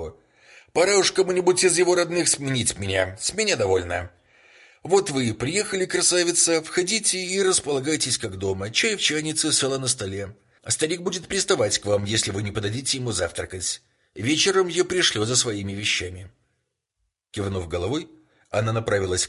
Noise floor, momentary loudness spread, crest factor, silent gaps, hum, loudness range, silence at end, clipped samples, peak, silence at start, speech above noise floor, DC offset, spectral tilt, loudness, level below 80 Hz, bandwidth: -77 dBFS; 10 LU; 18 dB; none; none; 4 LU; 0 s; under 0.1%; -6 dBFS; 0 s; 54 dB; under 0.1%; -3 dB/octave; -22 LUFS; -48 dBFS; 11.5 kHz